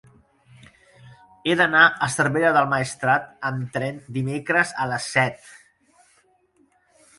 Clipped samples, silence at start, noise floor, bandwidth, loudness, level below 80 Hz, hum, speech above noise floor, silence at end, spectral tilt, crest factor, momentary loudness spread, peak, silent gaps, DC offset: under 0.1%; 1.05 s; -62 dBFS; 11.5 kHz; -21 LUFS; -62 dBFS; none; 41 dB; 1.65 s; -4.5 dB/octave; 22 dB; 13 LU; -2 dBFS; none; under 0.1%